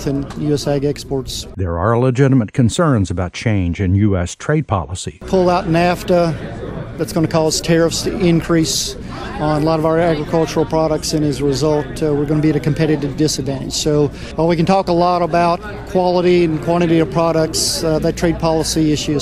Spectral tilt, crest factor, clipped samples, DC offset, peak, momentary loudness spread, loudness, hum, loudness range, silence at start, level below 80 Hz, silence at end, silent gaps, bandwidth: -5.5 dB/octave; 14 dB; under 0.1%; under 0.1%; 0 dBFS; 7 LU; -16 LUFS; none; 2 LU; 0 s; -34 dBFS; 0 s; none; 15.5 kHz